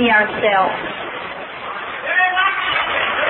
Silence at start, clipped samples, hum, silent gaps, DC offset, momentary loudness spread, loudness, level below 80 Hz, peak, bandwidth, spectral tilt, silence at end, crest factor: 0 s; under 0.1%; none; none; under 0.1%; 13 LU; -17 LUFS; -54 dBFS; -2 dBFS; 4.2 kHz; -7 dB/octave; 0 s; 16 dB